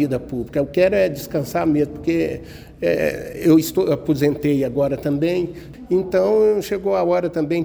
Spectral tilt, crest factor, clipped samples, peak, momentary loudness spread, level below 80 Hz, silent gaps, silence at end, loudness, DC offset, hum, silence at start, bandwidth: -7 dB/octave; 16 dB; under 0.1%; -4 dBFS; 9 LU; -46 dBFS; none; 0 s; -19 LUFS; under 0.1%; none; 0 s; over 20 kHz